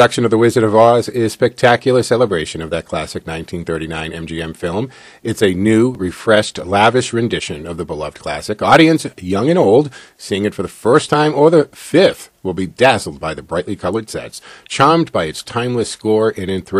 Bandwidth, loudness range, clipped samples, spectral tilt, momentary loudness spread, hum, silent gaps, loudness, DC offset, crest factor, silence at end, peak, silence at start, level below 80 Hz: 14 kHz; 5 LU; 0.2%; -5.5 dB/octave; 13 LU; none; none; -15 LUFS; under 0.1%; 14 dB; 0 s; 0 dBFS; 0 s; -46 dBFS